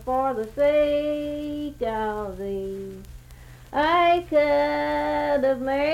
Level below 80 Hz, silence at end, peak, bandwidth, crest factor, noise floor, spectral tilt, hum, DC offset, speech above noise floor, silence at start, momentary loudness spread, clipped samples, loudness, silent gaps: -46 dBFS; 0 s; -10 dBFS; 15.5 kHz; 14 dB; -45 dBFS; -6 dB/octave; none; under 0.1%; 22 dB; 0 s; 11 LU; under 0.1%; -24 LUFS; none